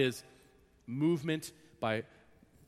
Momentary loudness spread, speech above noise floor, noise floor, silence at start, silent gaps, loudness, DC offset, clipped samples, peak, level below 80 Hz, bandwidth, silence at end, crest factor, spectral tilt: 18 LU; 30 dB; -64 dBFS; 0 s; none; -35 LUFS; under 0.1%; under 0.1%; -16 dBFS; -72 dBFS; 15.5 kHz; 0.6 s; 20 dB; -5.5 dB/octave